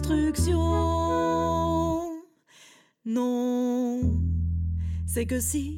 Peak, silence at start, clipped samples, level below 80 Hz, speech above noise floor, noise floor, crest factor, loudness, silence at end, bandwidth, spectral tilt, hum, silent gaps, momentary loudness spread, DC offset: -14 dBFS; 0 s; under 0.1%; -36 dBFS; 31 dB; -56 dBFS; 12 dB; -27 LUFS; 0 s; 16.5 kHz; -6.5 dB/octave; none; none; 6 LU; under 0.1%